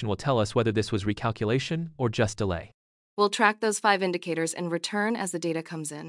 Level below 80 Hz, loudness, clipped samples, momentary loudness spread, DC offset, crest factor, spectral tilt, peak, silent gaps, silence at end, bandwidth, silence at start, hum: -56 dBFS; -27 LUFS; under 0.1%; 8 LU; under 0.1%; 22 dB; -5 dB/octave; -4 dBFS; 2.74-3.17 s; 0 s; 12 kHz; 0 s; none